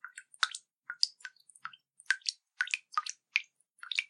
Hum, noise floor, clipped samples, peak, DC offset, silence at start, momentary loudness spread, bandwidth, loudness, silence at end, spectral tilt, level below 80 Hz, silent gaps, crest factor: none; -54 dBFS; under 0.1%; -8 dBFS; under 0.1%; 0.05 s; 17 LU; 13 kHz; -34 LUFS; 0.05 s; 6.5 dB/octave; under -90 dBFS; none; 30 dB